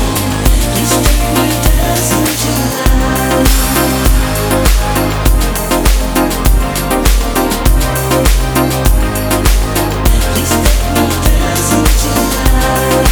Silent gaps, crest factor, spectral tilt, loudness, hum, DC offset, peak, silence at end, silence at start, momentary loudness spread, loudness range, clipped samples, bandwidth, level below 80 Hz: none; 10 dB; -4.5 dB/octave; -12 LUFS; none; under 0.1%; 0 dBFS; 0 s; 0 s; 2 LU; 1 LU; under 0.1%; over 20 kHz; -14 dBFS